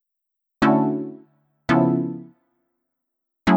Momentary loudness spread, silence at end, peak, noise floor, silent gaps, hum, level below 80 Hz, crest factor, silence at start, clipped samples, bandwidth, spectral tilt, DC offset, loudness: 16 LU; 0 s; -4 dBFS; -81 dBFS; none; none; -52 dBFS; 20 dB; 0.6 s; under 0.1%; 8.8 kHz; -8 dB/octave; under 0.1%; -21 LUFS